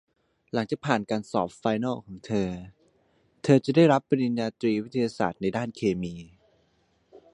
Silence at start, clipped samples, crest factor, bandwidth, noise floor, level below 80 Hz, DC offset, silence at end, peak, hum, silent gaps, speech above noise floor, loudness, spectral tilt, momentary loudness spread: 0.55 s; under 0.1%; 22 dB; 11 kHz; -68 dBFS; -60 dBFS; under 0.1%; 1.1 s; -6 dBFS; none; none; 42 dB; -26 LUFS; -7 dB/octave; 12 LU